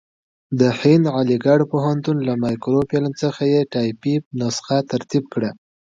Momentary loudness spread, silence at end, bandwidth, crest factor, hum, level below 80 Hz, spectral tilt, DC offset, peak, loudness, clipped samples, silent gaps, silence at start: 8 LU; 0.45 s; 7.8 kHz; 18 dB; none; -56 dBFS; -7 dB/octave; under 0.1%; -2 dBFS; -19 LUFS; under 0.1%; 4.26-4.31 s; 0.5 s